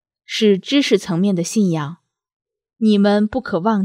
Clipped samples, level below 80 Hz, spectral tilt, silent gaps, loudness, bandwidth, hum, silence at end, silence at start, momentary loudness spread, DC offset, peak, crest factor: under 0.1%; -54 dBFS; -5.5 dB/octave; 2.33-2.40 s; -17 LUFS; 14 kHz; none; 0 s; 0.3 s; 6 LU; under 0.1%; -2 dBFS; 16 dB